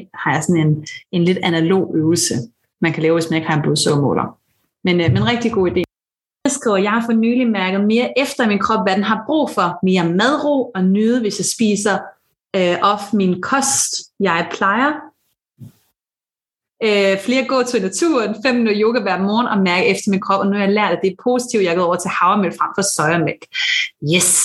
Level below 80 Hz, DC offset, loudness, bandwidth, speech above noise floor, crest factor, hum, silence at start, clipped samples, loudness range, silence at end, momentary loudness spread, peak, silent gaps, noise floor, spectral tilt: -56 dBFS; under 0.1%; -17 LUFS; 13 kHz; over 74 dB; 16 dB; none; 0 s; under 0.1%; 3 LU; 0 s; 4 LU; -2 dBFS; none; under -90 dBFS; -4.5 dB/octave